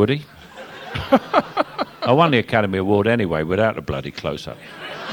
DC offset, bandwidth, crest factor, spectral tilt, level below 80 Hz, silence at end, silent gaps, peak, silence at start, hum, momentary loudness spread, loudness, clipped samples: under 0.1%; 17 kHz; 20 dB; -7 dB/octave; -46 dBFS; 0 s; none; 0 dBFS; 0 s; none; 18 LU; -20 LUFS; under 0.1%